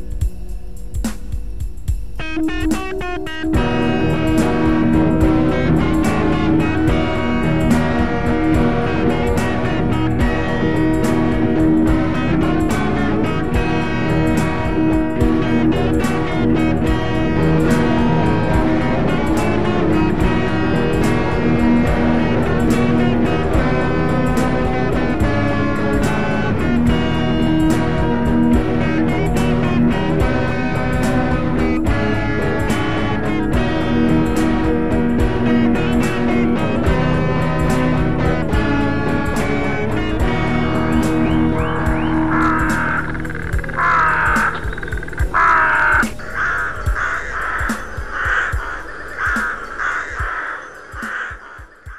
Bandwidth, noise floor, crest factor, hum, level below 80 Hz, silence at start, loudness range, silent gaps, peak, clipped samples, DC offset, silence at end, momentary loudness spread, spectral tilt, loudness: 13.5 kHz; -38 dBFS; 12 dB; none; -26 dBFS; 0 s; 3 LU; none; -4 dBFS; under 0.1%; 5%; 0 s; 8 LU; -7 dB/octave; -17 LUFS